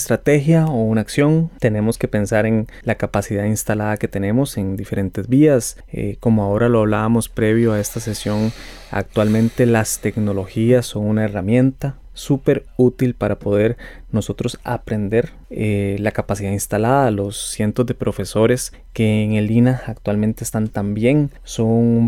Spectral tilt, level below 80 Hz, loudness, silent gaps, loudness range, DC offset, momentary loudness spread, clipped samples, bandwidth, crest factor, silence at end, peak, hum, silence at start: -6.5 dB/octave; -40 dBFS; -18 LUFS; none; 3 LU; under 0.1%; 8 LU; under 0.1%; 16.5 kHz; 14 dB; 0 s; -4 dBFS; none; 0 s